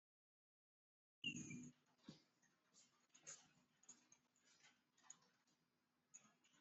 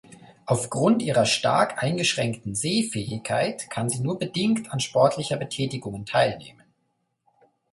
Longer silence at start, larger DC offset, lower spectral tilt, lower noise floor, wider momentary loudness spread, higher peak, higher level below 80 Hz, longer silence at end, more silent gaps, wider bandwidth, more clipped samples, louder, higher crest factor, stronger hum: first, 1.25 s vs 0.1 s; neither; second, -2.5 dB/octave vs -4.5 dB/octave; first, -88 dBFS vs -74 dBFS; first, 17 LU vs 8 LU; second, -38 dBFS vs -4 dBFS; second, under -90 dBFS vs -60 dBFS; second, 0 s vs 1.2 s; neither; second, 8 kHz vs 11.5 kHz; neither; second, -58 LUFS vs -24 LUFS; first, 26 dB vs 20 dB; neither